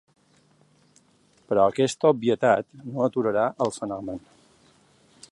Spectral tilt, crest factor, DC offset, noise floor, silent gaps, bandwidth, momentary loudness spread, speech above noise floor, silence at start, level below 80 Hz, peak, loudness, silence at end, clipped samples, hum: -5.5 dB/octave; 20 dB; under 0.1%; -62 dBFS; none; 11.5 kHz; 13 LU; 38 dB; 1.5 s; -64 dBFS; -6 dBFS; -24 LUFS; 1.15 s; under 0.1%; none